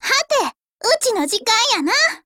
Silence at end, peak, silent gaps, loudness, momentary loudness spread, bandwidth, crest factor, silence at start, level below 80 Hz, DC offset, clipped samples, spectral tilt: 0.1 s; -4 dBFS; 0.68-0.78 s; -17 LUFS; 6 LU; 17 kHz; 14 dB; 0 s; -64 dBFS; under 0.1%; under 0.1%; 0.5 dB/octave